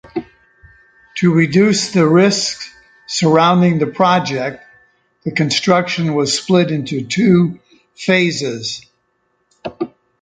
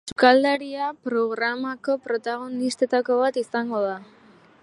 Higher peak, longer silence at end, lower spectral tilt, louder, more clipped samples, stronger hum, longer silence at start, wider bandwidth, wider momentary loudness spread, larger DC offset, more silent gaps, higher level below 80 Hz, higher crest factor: about the same, 0 dBFS vs -2 dBFS; second, 0.35 s vs 0.6 s; first, -5 dB/octave vs -3.5 dB/octave; first, -15 LUFS vs -23 LUFS; neither; neither; about the same, 0.05 s vs 0.05 s; second, 9.4 kHz vs 11.5 kHz; first, 16 LU vs 11 LU; neither; neither; first, -56 dBFS vs -68 dBFS; second, 16 dB vs 22 dB